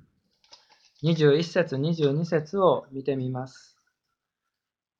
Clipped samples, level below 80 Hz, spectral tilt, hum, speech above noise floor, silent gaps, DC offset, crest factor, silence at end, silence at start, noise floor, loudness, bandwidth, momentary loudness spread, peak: under 0.1%; -68 dBFS; -7 dB/octave; none; 64 dB; none; under 0.1%; 20 dB; 1.5 s; 1 s; -88 dBFS; -25 LUFS; 7.6 kHz; 10 LU; -8 dBFS